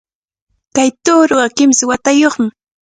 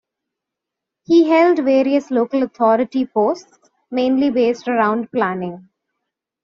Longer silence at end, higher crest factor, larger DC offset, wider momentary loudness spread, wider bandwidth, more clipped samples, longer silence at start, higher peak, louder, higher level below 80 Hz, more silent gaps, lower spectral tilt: second, 0.5 s vs 0.85 s; about the same, 14 dB vs 16 dB; neither; about the same, 9 LU vs 8 LU; first, 9.6 kHz vs 7.2 kHz; neither; second, 0.75 s vs 1.1 s; about the same, 0 dBFS vs -2 dBFS; first, -12 LUFS vs -17 LUFS; first, -54 dBFS vs -64 dBFS; neither; second, -2.5 dB/octave vs -4.5 dB/octave